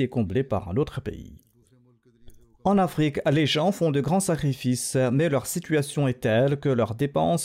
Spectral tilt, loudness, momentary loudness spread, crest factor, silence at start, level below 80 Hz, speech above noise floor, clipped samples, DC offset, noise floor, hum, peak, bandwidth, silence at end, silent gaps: -5.5 dB/octave; -24 LUFS; 5 LU; 12 dB; 0 s; -52 dBFS; 36 dB; under 0.1%; under 0.1%; -59 dBFS; none; -12 dBFS; 16 kHz; 0 s; none